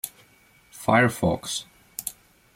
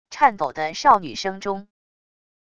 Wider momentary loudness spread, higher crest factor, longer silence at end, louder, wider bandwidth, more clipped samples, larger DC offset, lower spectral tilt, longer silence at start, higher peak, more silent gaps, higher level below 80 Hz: first, 16 LU vs 12 LU; about the same, 20 dB vs 20 dB; second, 0.45 s vs 0.8 s; second, -25 LUFS vs -21 LUFS; first, 16.5 kHz vs 8.4 kHz; neither; second, under 0.1% vs 0.4%; about the same, -4.5 dB/octave vs -3.5 dB/octave; about the same, 0.05 s vs 0.1 s; second, -6 dBFS vs -2 dBFS; neither; about the same, -56 dBFS vs -58 dBFS